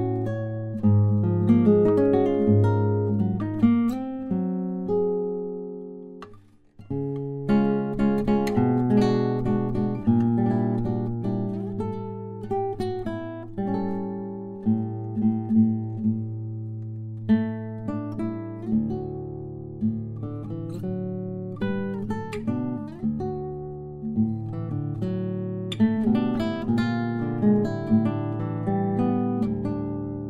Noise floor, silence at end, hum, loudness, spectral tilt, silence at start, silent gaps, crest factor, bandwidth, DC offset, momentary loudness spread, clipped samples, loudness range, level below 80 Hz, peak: -50 dBFS; 0 s; none; -25 LUFS; -9.5 dB/octave; 0 s; none; 18 dB; 7.6 kHz; under 0.1%; 13 LU; under 0.1%; 9 LU; -50 dBFS; -8 dBFS